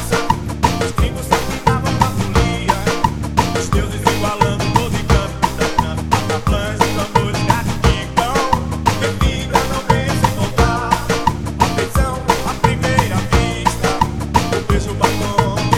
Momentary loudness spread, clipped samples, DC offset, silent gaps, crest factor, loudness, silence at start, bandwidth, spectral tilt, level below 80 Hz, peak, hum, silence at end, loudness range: 2 LU; under 0.1%; under 0.1%; none; 16 dB; -17 LUFS; 0 s; 17.5 kHz; -5 dB/octave; -24 dBFS; 0 dBFS; none; 0 s; 1 LU